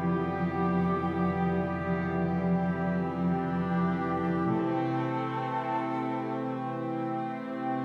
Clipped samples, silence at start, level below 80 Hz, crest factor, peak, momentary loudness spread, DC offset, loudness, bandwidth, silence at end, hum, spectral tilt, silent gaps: under 0.1%; 0 s; -56 dBFS; 12 dB; -16 dBFS; 5 LU; under 0.1%; -30 LUFS; 5.6 kHz; 0 s; none; -9.5 dB/octave; none